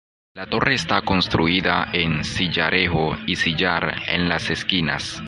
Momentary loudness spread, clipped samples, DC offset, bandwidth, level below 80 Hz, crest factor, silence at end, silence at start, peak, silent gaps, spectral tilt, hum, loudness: 4 LU; under 0.1%; under 0.1%; 11.5 kHz; -40 dBFS; 20 dB; 0 s; 0.35 s; 0 dBFS; none; -4.5 dB/octave; none; -20 LUFS